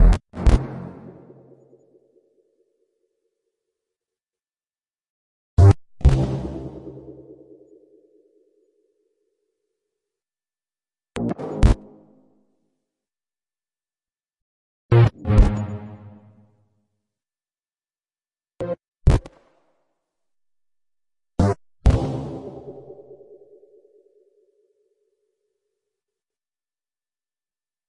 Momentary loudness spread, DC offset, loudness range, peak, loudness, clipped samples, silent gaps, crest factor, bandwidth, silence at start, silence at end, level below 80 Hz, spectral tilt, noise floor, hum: 25 LU; under 0.1%; 15 LU; -2 dBFS; -21 LUFS; under 0.1%; 5.10-5.57 s, 14.42-14.89 s, 18.88-18.92 s; 24 dB; 11 kHz; 0 s; 4.95 s; -28 dBFS; -8 dB/octave; under -90 dBFS; none